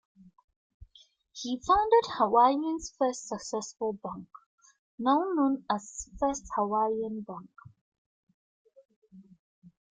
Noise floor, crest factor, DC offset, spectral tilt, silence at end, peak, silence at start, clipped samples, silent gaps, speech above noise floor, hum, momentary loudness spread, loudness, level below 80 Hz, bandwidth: -62 dBFS; 20 dB; under 0.1%; -4.5 dB/octave; 0.7 s; -10 dBFS; 0.8 s; under 0.1%; 4.46-4.58 s, 4.79-4.98 s, 7.81-7.92 s, 7.98-8.27 s, 8.34-8.65 s, 8.96-9.02 s; 33 dB; none; 17 LU; -29 LUFS; -60 dBFS; 9.6 kHz